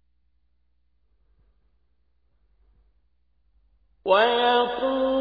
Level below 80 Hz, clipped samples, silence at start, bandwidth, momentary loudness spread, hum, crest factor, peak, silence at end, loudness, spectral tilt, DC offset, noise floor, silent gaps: -60 dBFS; under 0.1%; 4.05 s; 5 kHz; 6 LU; 60 Hz at -70 dBFS; 22 dB; -6 dBFS; 0 s; -21 LUFS; -5.5 dB/octave; under 0.1%; -71 dBFS; none